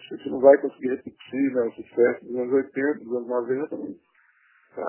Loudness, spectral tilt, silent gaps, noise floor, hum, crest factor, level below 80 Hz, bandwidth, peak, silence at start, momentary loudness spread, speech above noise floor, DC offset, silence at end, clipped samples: -24 LUFS; -10 dB/octave; none; -61 dBFS; none; 22 dB; -70 dBFS; 3.2 kHz; -4 dBFS; 0.1 s; 16 LU; 38 dB; under 0.1%; 0 s; under 0.1%